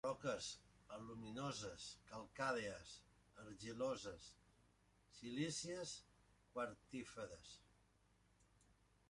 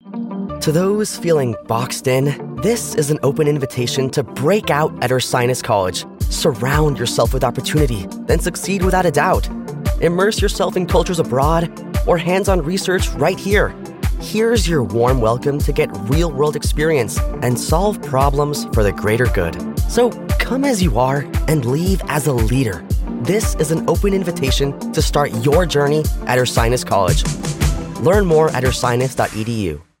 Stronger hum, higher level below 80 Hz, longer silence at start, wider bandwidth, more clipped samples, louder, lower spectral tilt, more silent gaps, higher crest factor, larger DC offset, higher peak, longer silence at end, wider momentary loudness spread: first, 60 Hz at -75 dBFS vs none; second, -74 dBFS vs -26 dBFS; about the same, 0.05 s vs 0.05 s; second, 11.5 kHz vs 16.5 kHz; neither; second, -49 LUFS vs -17 LUFS; second, -4 dB/octave vs -5.5 dB/octave; neither; first, 22 dB vs 16 dB; neither; second, -30 dBFS vs -2 dBFS; first, 0.65 s vs 0.2 s; first, 16 LU vs 6 LU